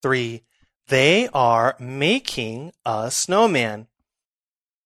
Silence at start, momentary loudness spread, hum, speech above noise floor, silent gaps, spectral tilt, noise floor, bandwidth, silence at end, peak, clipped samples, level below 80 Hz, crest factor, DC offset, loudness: 0.05 s; 14 LU; none; over 70 dB; 0.76-0.80 s; -3.5 dB/octave; under -90 dBFS; 15 kHz; 1.05 s; -2 dBFS; under 0.1%; -60 dBFS; 18 dB; under 0.1%; -20 LUFS